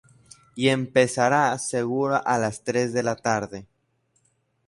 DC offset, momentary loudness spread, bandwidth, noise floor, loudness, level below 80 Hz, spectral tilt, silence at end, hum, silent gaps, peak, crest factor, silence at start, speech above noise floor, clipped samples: under 0.1%; 7 LU; 11.5 kHz; -69 dBFS; -23 LUFS; -62 dBFS; -4.5 dB/octave; 1.05 s; none; none; -6 dBFS; 20 dB; 0.55 s; 46 dB; under 0.1%